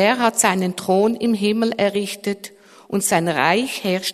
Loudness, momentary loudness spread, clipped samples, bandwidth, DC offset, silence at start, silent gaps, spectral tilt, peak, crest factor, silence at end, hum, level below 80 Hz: -19 LUFS; 10 LU; under 0.1%; 13.5 kHz; under 0.1%; 0 s; none; -3.5 dB/octave; -2 dBFS; 18 dB; 0 s; none; -62 dBFS